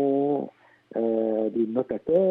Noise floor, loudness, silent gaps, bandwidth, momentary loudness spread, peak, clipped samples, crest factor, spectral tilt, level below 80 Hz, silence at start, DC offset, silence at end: -49 dBFS; -26 LUFS; none; 4 kHz; 8 LU; -10 dBFS; under 0.1%; 14 dB; -11 dB/octave; -66 dBFS; 0 s; under 0.1%; 0 s